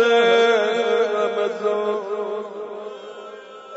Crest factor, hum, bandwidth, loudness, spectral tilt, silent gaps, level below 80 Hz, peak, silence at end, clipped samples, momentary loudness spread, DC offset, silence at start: 14 dB; none; 8 kHz; -20 LUFS; -3 dB/octave; none; -84 dBFS; -6 dBFS; 0 s; under 0.1%; 21 LU; under 0.1%; 0 s